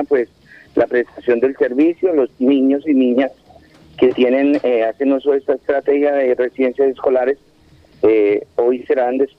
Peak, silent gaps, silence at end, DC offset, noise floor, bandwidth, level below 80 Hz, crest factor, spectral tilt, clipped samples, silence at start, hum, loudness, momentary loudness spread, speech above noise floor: -2 dBFS; none; 0.1 s; under 0.1%; -49 dBFS; 5.4 kHz; -56 dBFS; 14 dB; -7.5 dB/octave; under 0.1%; 0 s; none; -16 LUFS; 5 LU; 34 dB